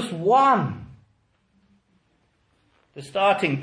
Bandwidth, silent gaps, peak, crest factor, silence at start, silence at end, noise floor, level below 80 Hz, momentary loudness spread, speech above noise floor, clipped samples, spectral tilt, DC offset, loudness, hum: 10.5 kHz; none; -6 dBFS; 18 dB; 0 s; 0 s; -66 dBFS; -62 dBFS; 19 LU; 46 dB; under 0.1%; -6 dB/octave; under 0.1%; -21 LUFS; none